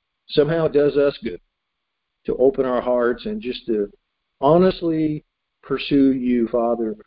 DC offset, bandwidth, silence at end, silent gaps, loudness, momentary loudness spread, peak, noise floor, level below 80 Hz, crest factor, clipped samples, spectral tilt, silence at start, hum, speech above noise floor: under 0.1%; 5.2 kHz; 0.05 s; none; -20 LUFS; 12 LU; -2 dBFS; -78 dBFS; -50 dBFS; 18 dB; under 0.1%; -11.5 dB/octave; 0.3 s; none; 59 dB